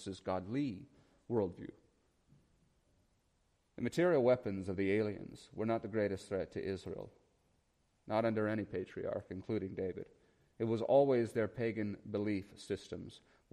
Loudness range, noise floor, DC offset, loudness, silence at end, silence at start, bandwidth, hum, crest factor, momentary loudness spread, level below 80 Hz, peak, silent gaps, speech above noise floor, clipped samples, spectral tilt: 6 LU; -76 dBFS; under 0.1%; -37 LUFS; 0.35 s; 0 s; 13 kHz; none; 20 dB; 17 LU; -70 dBFS; -18 dBFS; none; 40 dB; under 0.1%; -7 dB/octave